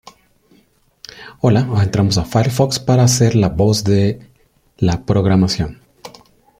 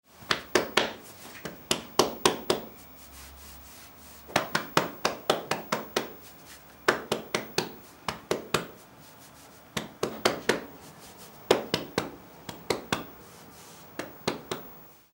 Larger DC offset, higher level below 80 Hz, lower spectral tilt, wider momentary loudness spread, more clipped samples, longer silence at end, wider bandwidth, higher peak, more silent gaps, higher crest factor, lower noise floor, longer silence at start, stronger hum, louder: neither; first, -40 dBFS vs -60 dBFS; first, -6 dB/octave vs -3 dB/octave; second, 11 LU vs 21 LU; neither; first, 0.5 s vs 0.2 s; about the same, 15.5 kHz vs 16.5 kHz; about the same, -2 dBFS vs -2 dBFS; neither; second, 14 dB vs 30 dB; about the same, -55 dBFS vs -52 dBFS; first, 1.15 s vs 0.15 s; neither; first, -15 LUFS vs -30 LUFS